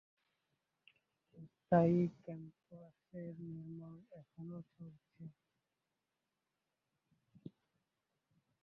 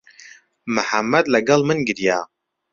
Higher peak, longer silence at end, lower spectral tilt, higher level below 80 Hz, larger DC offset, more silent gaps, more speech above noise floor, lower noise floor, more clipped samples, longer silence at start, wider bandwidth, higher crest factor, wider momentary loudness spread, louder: second, -20 dBFS vs -2 dBFS; first, 3.3 s vs 0.5 s; first, -9.5 dB/octave vs -4.5 dB/octave; second, -80 dBFS vs -60 dBFS; neither; neither; first, 50 dB vs 28 dB; first, -89 dBFS vs -47 dBFS; neither; first, 1.35 s vs 0.25 s; second, 5 kHz vs 7.6 kHz; first, 24 dB vs 18 dB; first, 27 LU vs 10 LU; second, -38 LUFS vs -19 LUFS